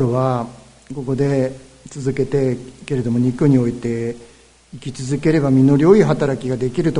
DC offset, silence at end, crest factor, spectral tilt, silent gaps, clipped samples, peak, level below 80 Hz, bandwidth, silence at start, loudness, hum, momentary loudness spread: under 0.1%; 0 s; 18 dB; -8 dB/octave; none; under 0.1%; 0 dBFS; -46 dBFS; 11 kHz; 0 s; -18 LUFS; none; 19 LU